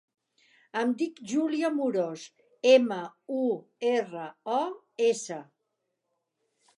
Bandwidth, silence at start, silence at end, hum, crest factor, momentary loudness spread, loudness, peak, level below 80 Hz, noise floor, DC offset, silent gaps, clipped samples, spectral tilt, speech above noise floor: 11.5 kHz; 0.75 s; 1.35 s; none; 20 dB; 16 LU; -28 LUFS; -8 dBFS; -88 dBFS; -81 dBFS; under 0.1%; none; under 0.1%; -4 dB/octave; 53 dB